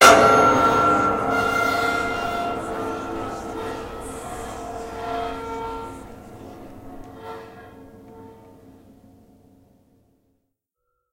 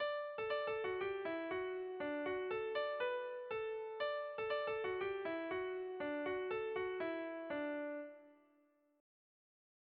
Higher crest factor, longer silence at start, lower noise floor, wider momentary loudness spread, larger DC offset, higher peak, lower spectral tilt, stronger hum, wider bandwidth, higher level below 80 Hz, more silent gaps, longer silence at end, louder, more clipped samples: first, 24 dB vs 14 dB; about the same, 0 s vs 0 s; about the same, -77 dBFS vs -75 dBFS; first, 25 LU vs 4 LU; neither; first, 0 dBFS vs -30 dBFS; first, -3.5 dB/octave vs -2 dB/octave; neither; first, 16 kHz vs 5 kHz; first, -46 dBFS vs -76 dBFS; neither; first, 2.8 s vs 1.65 s; first, -21 LUFS vs -42 LUFS; neither